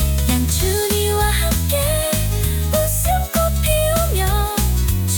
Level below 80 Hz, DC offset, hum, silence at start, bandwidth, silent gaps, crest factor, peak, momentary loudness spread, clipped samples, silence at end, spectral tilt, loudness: -22 dBFS; under 0.1%; none; 0 s; 19.5 kHz; none; 12 dB; -4 dBFS; 2 LU; under 0.1%; 0 s; -4.5 dB/octave; -18 LUFS